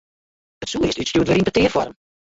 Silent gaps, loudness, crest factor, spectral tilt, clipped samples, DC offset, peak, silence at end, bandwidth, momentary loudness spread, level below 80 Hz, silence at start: none; -20 LUFS; 16 dB; -5 dB/octave; under 0.1%; under 0.1%; -4 dBFS; 0.4 s; 8 kHz; 12 LU; -42 dBFS; 0.6 s